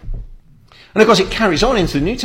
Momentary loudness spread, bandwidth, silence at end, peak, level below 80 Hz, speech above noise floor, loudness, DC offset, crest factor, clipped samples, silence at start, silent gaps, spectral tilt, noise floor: 17 LU; 16.5 kHz; 0 s; 0 dBFS; -28 dBFS; 31 dB; -14 LUFS; under 0.1%; 16 dB; under 0.1%; 0.05 s; none; -4.5 dB/octave; -45 dBFS